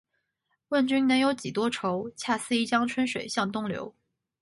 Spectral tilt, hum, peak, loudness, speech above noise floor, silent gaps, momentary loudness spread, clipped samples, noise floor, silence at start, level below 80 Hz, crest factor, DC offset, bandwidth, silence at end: -4 dB/octave; none; -12 dBFS; -27 LUFS; 51 dB; none; 9 LU; under 0.1%; -78 dBFS; 0.7 s; -68 dBFS; 16 dB; under 0.1%; 11.5 kHz; 0.5 s